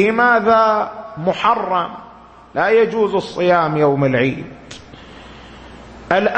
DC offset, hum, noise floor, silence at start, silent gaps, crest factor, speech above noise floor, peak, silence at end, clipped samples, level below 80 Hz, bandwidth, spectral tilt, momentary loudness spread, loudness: under 0.1%; none; -38 dBFS; 0 s; none; 16 dB; 23 dB; -2 dBFS; 0 s; under 0.1%; -50 dBFS; 8.6 kHz; -6.5 dB/octave; 21 LU; -16 LUFS